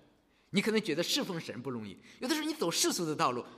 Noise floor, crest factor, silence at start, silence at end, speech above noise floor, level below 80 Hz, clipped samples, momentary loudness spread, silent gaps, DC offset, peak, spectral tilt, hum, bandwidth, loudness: -67 dBFS; 20 dB; 0.5 s; 0 s; 34 dB; -76 dBFS; under 0.1%; 11 LU; none; under 0.1%; -14 dBFS; -3 dB/octave; none; 15.5 kHz; -32 LUFS